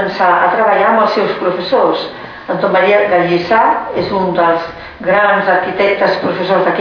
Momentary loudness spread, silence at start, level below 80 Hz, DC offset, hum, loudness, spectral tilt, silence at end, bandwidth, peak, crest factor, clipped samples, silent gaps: 7 LU; 0 s; -48 dBFS; under 0.1%; none; -12 LUFS; -7 dB/octave; 0 s; 5.4 kHz; 0 dBFS; 12 dB; under 0.1%; none